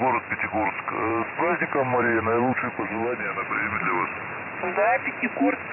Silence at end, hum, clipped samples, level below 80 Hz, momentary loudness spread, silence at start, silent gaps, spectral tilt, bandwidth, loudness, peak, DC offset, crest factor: 0 s; none; under 0.1%; -70 dBFS; 6 LU; 0 s; none; -10.5 dB/octave; 3 kHz; -25 LUFS; -12 dBFS; under 0.1%; 12 dB